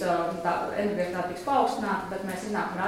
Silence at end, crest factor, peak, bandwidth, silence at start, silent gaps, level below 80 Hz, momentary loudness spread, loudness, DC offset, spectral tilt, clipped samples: 0 s; 16 dB; -12 dBFS; 16.5 kHz; 0 s; none; -60 dBFS; 6 LU; -29 LUFS; under 0.1%; -5.5 dB/octave; under 0.1%